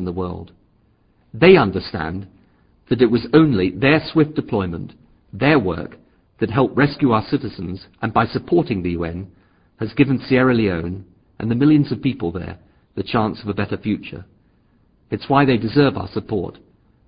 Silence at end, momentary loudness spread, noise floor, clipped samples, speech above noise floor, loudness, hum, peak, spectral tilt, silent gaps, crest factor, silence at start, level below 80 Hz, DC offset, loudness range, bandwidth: 0.55 s; 17 LU; -58 dBFS; under 0.1%; 40 dB; -19 LUFS; none; 0 dBFS; -11.5 dB/octave; none; 20 dB; 0 s; -42 dBFS; under 0.1%; 4 LU; 5.2 kHz